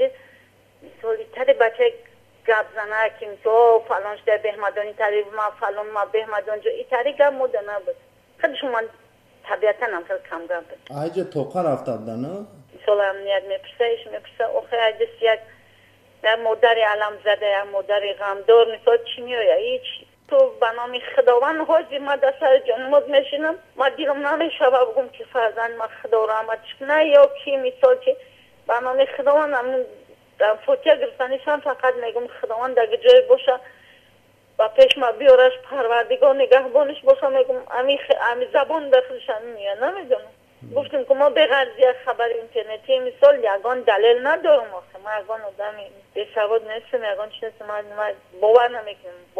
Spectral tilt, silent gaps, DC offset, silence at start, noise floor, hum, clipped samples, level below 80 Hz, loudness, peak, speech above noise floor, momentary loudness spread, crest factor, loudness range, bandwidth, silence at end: -4.5 dB/octave; none; under 0.1%; 0 s; -56 dBFS; none; under 0.1%; -68 dBFS; -20 LUFS; -2 dBFS; 36 dB; 13 LU; 18 dB; 7 LU; 6.6 kHz; 0 s